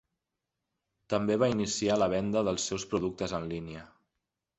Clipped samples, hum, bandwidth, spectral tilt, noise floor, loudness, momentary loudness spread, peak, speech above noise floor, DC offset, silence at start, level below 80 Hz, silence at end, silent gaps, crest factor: under 0.1%; none; 8.4 kHz; -4.5 dB/octave; -87 dBFS; -30 LUFS; 11 LU; -12 dBFS; 57 dB; under 0.1%; 1.1 s; -58 dBFS; 0.75 s; none; 20 dB